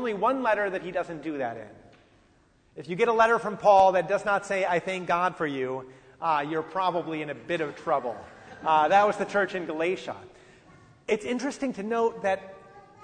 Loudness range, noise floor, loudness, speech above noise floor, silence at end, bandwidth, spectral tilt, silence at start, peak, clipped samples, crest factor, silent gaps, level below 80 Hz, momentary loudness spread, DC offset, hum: 6 LU; -62 dBFS; -26 LUFS; 36 dB; 0.25 s; 9.6 kHz; -5 dB/octave; 0 s; -8 dBFS; under 0.1%; 20 dB; none; -64 dBFS; 14 LU; under 0.1%; none